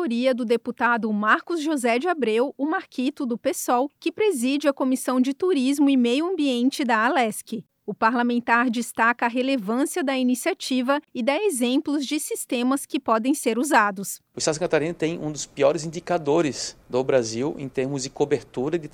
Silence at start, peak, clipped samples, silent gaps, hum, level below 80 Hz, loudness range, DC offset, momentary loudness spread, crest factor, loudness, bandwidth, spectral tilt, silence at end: 0 s; -4 dBFS; under 0.1%; none; none; -64 dBFS; 2 LU; under 0.1%; 7 LU; 18 dB; -23 LUFS; 17.5 kHz; -4 dB/octave; 0.05 s